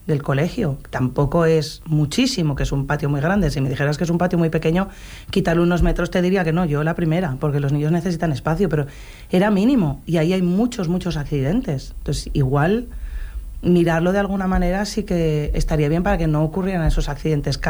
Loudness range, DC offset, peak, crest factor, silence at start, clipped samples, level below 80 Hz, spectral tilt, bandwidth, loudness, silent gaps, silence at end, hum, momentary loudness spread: 1 LU; under 0.1%; -6 dBFS; 12 dB; 0.05 s; under 0.1%; -30 dBFS; -7 dB/octave; over 20 kHz; -20 LUFS; none; 0 s; none; 7 LU